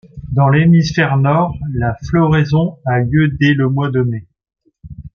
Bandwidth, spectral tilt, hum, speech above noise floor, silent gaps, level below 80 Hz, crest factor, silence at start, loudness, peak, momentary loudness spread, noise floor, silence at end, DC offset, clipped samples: 6.8 kHz; -8 dB/octave; none; 21 dB; none; -38 dBFS; 14 dB; 0.15 s; -14 LUFS; 0 dBFS; 8 LU; -34 dBFS; 0.05 s; under 0.1%; under 0.1%